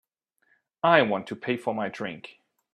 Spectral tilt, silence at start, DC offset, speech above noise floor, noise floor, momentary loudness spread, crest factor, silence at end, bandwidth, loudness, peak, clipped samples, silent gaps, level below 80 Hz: -6 dB/octave; 0.85 s; under 0.1%; 45 dB; -71 dBFS; 17 LU; 26 dB; 0.45 s; 11 kHz; -26 LUFS; -2 dBFS; under 0.1%; none; -74 dBFS